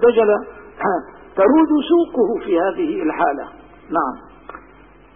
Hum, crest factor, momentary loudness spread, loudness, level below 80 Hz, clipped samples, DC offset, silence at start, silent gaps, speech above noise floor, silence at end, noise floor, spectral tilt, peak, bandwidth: none; 14 dB; 22 LU; -18 LUFS; -50 dBFS; under 0.1%; 0.2%; 0 s; none; 30 dB; 0.55 s; -46 dBFS; -10.5 dB/octave; -4 dBFS; 3.7 kHz